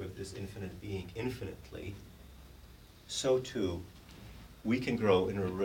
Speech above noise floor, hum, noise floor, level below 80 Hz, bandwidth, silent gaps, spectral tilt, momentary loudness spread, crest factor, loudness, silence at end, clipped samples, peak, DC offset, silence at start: 21 dB; none; -55 dBFS; -56 dBFS; 17 kHz; none; -5.5 dB/octave; 25 LU; 22 dB; -35 LUFS; 0 s; under 0.1%; -14 dBFS; under 0.1%; 0 s